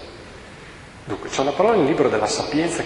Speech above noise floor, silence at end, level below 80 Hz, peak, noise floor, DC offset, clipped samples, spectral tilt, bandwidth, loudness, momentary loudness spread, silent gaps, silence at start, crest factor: 21 dB; 0 s; -48 dBFS; -4 dBFS; -41 dBFS; under 0.1%; under 0.1%; -4.5 dB/octave; 11.5 kHz; -20 LUFS; 22 LU; none; 0 s; 18 dB